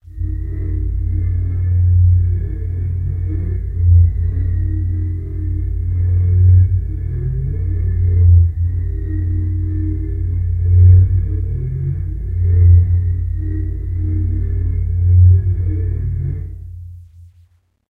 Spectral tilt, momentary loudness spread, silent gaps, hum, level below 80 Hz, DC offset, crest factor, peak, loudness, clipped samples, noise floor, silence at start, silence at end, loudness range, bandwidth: -12.5 dB/octave; 12 LU; none; none; -22 dBFS; under 0.1%; 14 dB; 0 dBFS; -16 LUFS; under 0.1%; -52 dBFS; 0.1 s; 0.7 s; 3 LU; 2.1 kHz